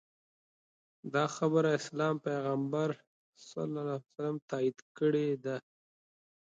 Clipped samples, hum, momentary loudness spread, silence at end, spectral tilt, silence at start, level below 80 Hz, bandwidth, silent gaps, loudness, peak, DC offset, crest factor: under 0.1%; none; 10 LU; 0.9 s; -6.5 dB/octave; 1.05 s; -82 dBFS; 9 kHz; 3.07-3.33 s, 4.42-4.48 s, 4.82-4.95 s; -34 LUFS; -16 dBFS; under 0.1%; 18 dB